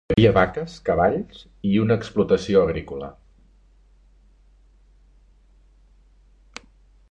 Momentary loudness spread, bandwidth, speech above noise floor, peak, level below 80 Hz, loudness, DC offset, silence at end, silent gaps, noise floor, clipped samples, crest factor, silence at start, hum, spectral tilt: 24 LU; 8.8 kHz; 34 dB; -2 dBFS; -44 dBFS; -21 LUFS; under 0.1%; 4 s; none; -54 dBFS; under 0.1%; 22 dB; 0.1 s; none; -7.5 dB/octave